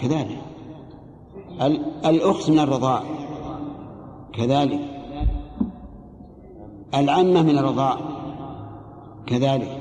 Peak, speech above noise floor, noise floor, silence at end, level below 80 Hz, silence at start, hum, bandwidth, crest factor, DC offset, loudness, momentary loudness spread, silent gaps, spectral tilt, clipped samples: -6 dBFS; 23 dB; -43 dBFS; 0 s; -38 dBFS; 0 s; none; 9.6 kHz; 16 dB; under 0.1%; -22 LUFS; 23 LU; none; -7 dB/octave; under 0.1%